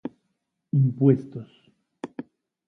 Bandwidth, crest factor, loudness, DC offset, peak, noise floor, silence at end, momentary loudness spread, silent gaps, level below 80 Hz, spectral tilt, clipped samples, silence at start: 3.6 kHz; 22 dB; -22 LUFS; under 0.1%; -6 dBFS; -77 dBFS; 0.45 s; 21 LU; none; -68 dBFS; -11.5 dB/octave; under 0.1%; 0.05 s